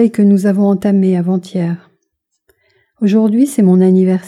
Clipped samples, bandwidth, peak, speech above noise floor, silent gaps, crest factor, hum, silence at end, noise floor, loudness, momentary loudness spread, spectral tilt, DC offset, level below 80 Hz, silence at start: under 0.1%; 13 kHz; -2 dBFS; 59 dB; none; 10 dB; none; 0 s; -70 dBFS; -12 LUFS; 9 LU; -8.5 dB/octave; under 0.1%; -60 dBFS; 0 s